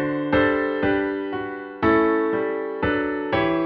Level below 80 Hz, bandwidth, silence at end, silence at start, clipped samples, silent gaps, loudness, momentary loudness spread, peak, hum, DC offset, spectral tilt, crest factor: -46 dBFS; 5.4 kHz; 0 s; 0 s; under 0.1%; none; -22 LUFS; 8 LU; -8 dBFS; none; under 0.1%; -9 dB/octave; 14 dB